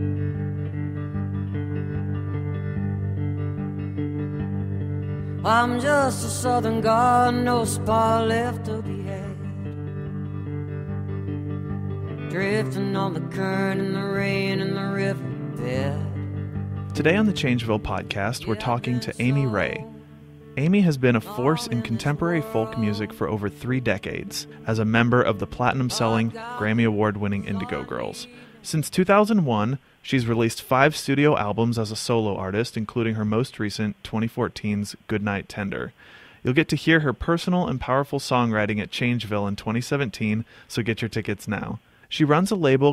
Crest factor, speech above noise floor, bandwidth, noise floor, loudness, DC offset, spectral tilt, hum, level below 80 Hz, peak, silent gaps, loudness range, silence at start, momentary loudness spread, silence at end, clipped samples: 20 dB; 22 dB; 16 kHz; -45 dBFS; -24 LUFS; under 0.1%; -6 dB/octave; none; -50 dBFS; -4 dBFS; none; 7 LU; 0 s; 11 LU; 0 s; under 0.1%